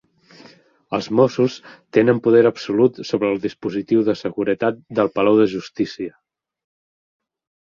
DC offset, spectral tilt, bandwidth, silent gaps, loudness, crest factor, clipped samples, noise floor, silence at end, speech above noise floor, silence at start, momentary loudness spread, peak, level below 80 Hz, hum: under 0.1%; -7 dB/octave; 7.2 kHz; none; -19 LUFS; 18 dB; under 0.1%; -49 dBFS; 1.55 s; 31 dB; 0.9 s; 11 LU; -2 dBFS; -60 dBFS; none